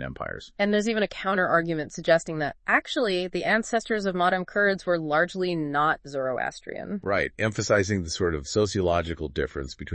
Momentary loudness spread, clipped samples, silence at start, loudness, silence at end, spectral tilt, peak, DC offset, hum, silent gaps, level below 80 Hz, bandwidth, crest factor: 8 LU; under 0.1%; 0 s; -26 LUFS; 0 s; -5 dB/octave; -6 dBFS; under 0.1%; none; none; -50 dBFS; 8.8 kHz; 20 dB